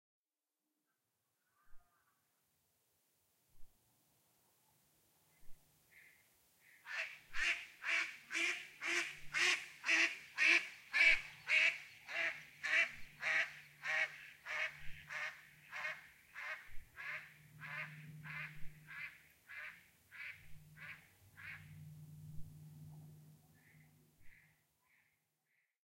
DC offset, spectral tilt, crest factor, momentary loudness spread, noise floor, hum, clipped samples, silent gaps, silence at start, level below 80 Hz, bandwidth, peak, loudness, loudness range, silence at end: under 0.1%; -1 dB/octave; 24 dB; 24 LU; under -90 dBFS; none; under 0.1%; none; 1.7 s; -66 dBFS; 16.5 kHz; -18 dBFS; -37 LUFS; 21 LU; 1.6 s